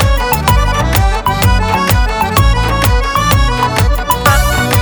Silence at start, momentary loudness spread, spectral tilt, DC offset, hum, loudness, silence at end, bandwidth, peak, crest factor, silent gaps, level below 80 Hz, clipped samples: 0 s; 2 LU; -4.5 dB/octave; under 0.1%; none; -12 LUFS; 0 s; over 20 kHz; 0 dBFS; 10 dB; none; -14 dBFS; under 0.1%